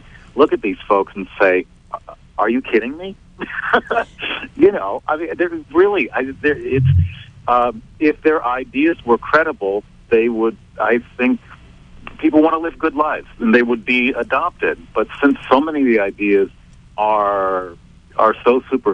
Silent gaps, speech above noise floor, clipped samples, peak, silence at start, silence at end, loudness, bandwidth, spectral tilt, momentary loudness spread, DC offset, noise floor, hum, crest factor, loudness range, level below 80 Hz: none; 25 dB; under 0.1%; 0 dBFS; 0.35 s; 0 s; -17 LUFS; 7.8 kHz; -8 dB/octave; 10 LU; under 0.1%; -41 dBFS; none; 16 dB; 2 LU; -42 dBFS